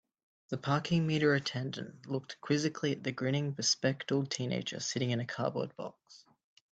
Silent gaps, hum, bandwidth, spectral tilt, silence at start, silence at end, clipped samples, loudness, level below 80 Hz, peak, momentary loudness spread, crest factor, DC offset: none; none; 9 kHz; -4.5 dB/octave; 0.5 s; 0.55 s; under 0.1%; -33 LUFS; -74 dBFS; -16 dBFS; 11 LU; 18 dB; under 0.1%